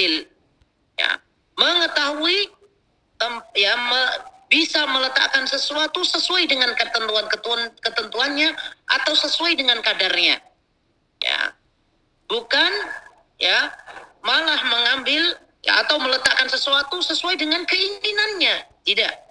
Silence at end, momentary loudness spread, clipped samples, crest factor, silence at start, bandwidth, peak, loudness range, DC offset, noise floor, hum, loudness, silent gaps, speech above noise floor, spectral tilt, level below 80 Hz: 0.15 s; 9 LU; under 0.1%; 22 dB; 0 s; 10.5 kHz; 0 dBFS; 3 LU; 0.1%; -66 dBFS; none; -19 LUFS; none; 45 dB; 0 dB/octave; -66 dBFS